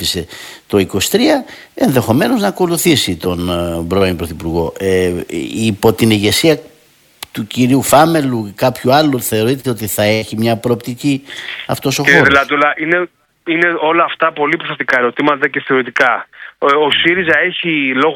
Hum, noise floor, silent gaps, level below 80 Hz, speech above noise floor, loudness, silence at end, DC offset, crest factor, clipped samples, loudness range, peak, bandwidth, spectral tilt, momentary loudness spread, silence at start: none; -49 dBFS; none; -42 dBFS; 36 dB; -13 LUFS; 0 s; under 0.1%; 14 dB; 0.2%; 3 LU; 0 dBFS; 19 kHz; -4.5 dB/octave; 10 LU; 0 s